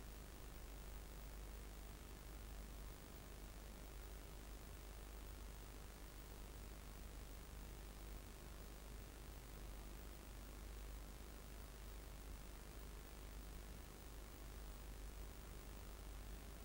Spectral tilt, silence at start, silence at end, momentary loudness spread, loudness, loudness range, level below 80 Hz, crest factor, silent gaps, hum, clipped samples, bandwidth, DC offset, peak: -4.5 dB/octave; 0 s; 0 s; 1 LU; -57 LUFS; 0 LU; -56 dBFS; 16 dB; none; none; under 0.1%; 16 kHz; under 0.1%; -40 dBFS